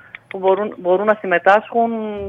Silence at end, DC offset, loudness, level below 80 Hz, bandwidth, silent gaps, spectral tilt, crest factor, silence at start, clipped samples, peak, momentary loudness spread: 0 s; under 0.1%; -17 LUFS; -56 dBFS; 7.6 kHz; none; -7 dB/octave; 18 dB; 0.35 s; under 0.1%; 0 dBFS; 7 LU